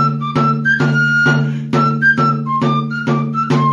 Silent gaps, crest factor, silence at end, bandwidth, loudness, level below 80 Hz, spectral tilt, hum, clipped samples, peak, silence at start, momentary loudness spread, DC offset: none; 12 dB; 0 s; 7.6 kHz; -14 LUFS; -54 dBFS; -7 dB/octave; none; under 0.1%; -2 dBFS; 0 s; 5 LU; under 0.1%